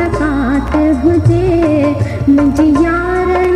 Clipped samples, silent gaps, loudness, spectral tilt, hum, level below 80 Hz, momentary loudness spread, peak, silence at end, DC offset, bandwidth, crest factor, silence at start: under 0.1%; none; -12 LUFS; -8.5 dB/octave; none; -24 dBFS; 4 LU; 0 dBFS; 0 s; under 0.1%; 10.5 kHz; 10 dB; 0 s